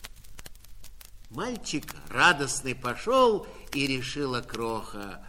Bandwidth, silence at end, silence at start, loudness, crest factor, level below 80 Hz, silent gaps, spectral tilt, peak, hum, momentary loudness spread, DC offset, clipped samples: 16.5 kHz; 0 s; 0 s; -27 LUFS; 22 dB; -48 dBFS; none; -3.5 dB/octave; -8 dBFS; none; 20 LU; under 0.1%; under 0.1%